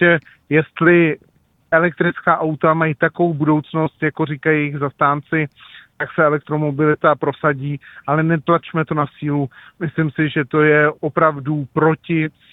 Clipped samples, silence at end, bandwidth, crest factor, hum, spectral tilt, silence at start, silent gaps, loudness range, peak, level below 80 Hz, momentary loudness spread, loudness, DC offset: under 0.1%; 0.25 s; 4 kHz; 18 dB; none; -10.5 dB/octave; 0 s; none; 3 LU; 0 dBFS; -56 dBFS; 8 LU; -18 LUFS; under 0.1%